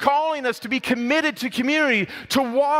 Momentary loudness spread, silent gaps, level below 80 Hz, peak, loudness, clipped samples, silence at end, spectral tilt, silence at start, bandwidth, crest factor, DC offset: 5 LU; none; -62 dBFS; -4 dBFS; -21 LUFS; under 0.1%; 0 s; -3.5 dB/octave; 0 s; 16 kHz; 18 dB; under 0.1%